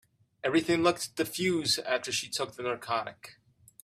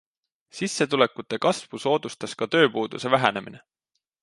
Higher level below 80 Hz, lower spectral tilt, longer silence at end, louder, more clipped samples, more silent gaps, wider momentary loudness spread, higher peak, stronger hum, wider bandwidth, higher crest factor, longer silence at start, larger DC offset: about the same, -70 dBFS vs -70 dBFS; about the same, -3.5 dB/octave vs -4 dB/octave; second, 0.5 s vs 0.65 s; second, -30 LUFS vs -24 LUFS; neither; neither; second, 9 LU vs 13 LU; second, -12 dBFS vs -2 dBFS; neither; first, 15.5 kHz vs 11.5 kHz; about the same, 20 dB vs 24 dB; about the same, 0.45 s vs 0.55 s; neither